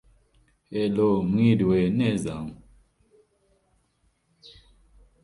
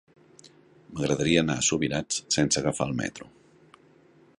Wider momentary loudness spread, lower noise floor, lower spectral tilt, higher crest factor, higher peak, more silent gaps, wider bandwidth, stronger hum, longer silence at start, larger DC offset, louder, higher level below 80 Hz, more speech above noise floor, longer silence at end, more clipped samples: first, 14 LU vs 11 LU; first, -69 dBFS vs -58 dBFS; first, -8 dB/octave vs -3.5 dB/octave; about the same, 20 dB vs 22 dB; about the same, -8 dBFS vs -8 dBFS; neither; about the same, 11.5 kHz vs 11.5 kHz; neither; first, 0.7 s vs 0.45 s; neither; about the same, -24 LUFS vs -26 LUFS; about the same, -54 dBFS vs -54 dBFS; first, 46 dB vs 32 dB; first, 2.7 s vs 1.15 s; neither